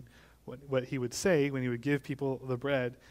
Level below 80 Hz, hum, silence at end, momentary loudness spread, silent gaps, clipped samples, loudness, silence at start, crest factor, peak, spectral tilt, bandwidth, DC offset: -62 dBFS; none; 0.15 s; 12 LU; none; under 0.1%; -32 LUFS; 0 s; 18 dB; -14 dBFS; -5.5 dB/octave; 16 kHz; under 0.1%